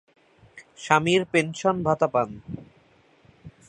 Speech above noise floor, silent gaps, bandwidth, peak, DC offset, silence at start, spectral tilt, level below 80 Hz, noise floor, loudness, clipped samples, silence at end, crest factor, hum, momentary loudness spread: 35 dB; none; 10 kHz; -2 dBFS; under 0.1%; 0.55 s; -5 dB/octave; -58 dBFS; -59 dBFS; -23 LUFS; under 0.1%; 0.2 s; 24 dB; none; 20 LU